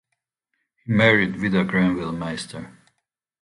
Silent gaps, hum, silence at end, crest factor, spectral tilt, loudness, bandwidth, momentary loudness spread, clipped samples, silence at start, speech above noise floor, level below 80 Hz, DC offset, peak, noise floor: none; none; 0.7 s; 20 dB; -6.5 dB/octave; -21 LUFS; 11 kHz; 18 LU; under 0.1%; 0.85 s; 58 dB; -52 dBFS; under 0.1%; -2 dBFS; -79 dBFS